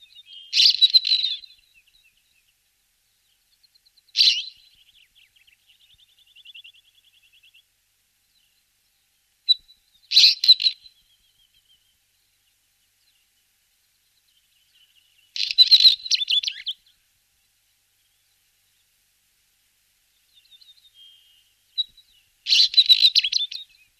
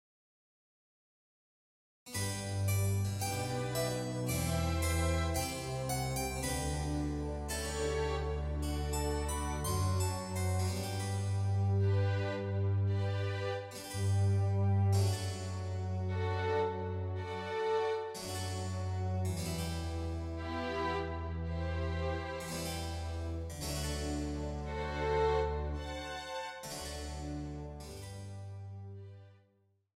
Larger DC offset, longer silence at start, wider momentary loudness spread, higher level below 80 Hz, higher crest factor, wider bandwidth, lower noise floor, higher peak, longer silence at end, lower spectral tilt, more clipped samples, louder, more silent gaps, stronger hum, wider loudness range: neither; second, 0.35 s vs 2.05 s; first, 20 LU vs 10 LU; second, -74 dBFS vs -46 dBFS; first, 22 dB vs 14 dB; second, 14 kHz vs 16 kHz; second, -68 dBFS vs -73 dBFS; first, -4 dBFS vs -22 dBFS; second, 0.35 s vs 0.65 s; second, 5.5 dB/octave vs -5.5 dB/octave; neither; first, -16 LUFS vs -36 LUFS; neither; neither; first, 13 LU vs 5 LU